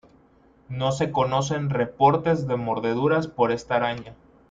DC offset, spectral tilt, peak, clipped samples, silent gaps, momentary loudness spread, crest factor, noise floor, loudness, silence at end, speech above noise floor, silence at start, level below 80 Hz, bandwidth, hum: under 0.1%; -6 dB/octave; -6 dBFS; under 0.1%; none; 7 LU; 20 dB; -57 dBFS; -23 LUFS; 0.4 s; 34 dB; 0.7 s; -56 dBFS; 7.8 kHz; none